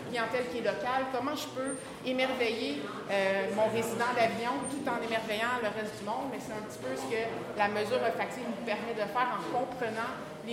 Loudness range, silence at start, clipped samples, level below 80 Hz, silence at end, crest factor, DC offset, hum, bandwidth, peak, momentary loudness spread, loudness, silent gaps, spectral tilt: 3 LU; 0 s; under 0.1%; -68 dBFS; 0 s; 18 dB; under 0.1%; none; 16 kHz; -14 dBFS; 8 LU; -32 LUFS; none; -4 dB/octave